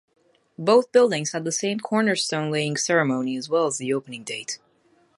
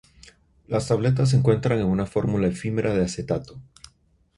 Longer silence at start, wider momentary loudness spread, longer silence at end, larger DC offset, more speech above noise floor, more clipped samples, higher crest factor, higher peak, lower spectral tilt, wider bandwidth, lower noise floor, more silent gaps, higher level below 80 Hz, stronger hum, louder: about the same, 0.6 s vs 0.7 s; first, 12 LU vs 9 LU; second, 0.6 s vs 0.75 s; neither; about the same, 39 dB vs 39 dB; neither; about the same, 20 dB vs 18 dB; about the same, -4 dBFS vs -6 dBFS; second, -4 dB/octave vs -7 dB/octave; about the same, 11.5 kHz vs 11.5 kHz; about the same, -62 dBFS vs -61 dBFS; neither; second, -74 dBFS vs -46 dBFS; neither; about the same, -23 LUFS vs -23 LUFS